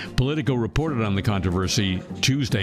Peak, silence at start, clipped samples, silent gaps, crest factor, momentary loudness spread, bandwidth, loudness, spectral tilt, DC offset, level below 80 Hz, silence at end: -8 dBFS; 0 s; under 0.1%; none; 16 dB; 2 LU; 15.5 kHz; -23 LUFS; -5 dB/octave; under 0.1%; -38 dBFS; 0 s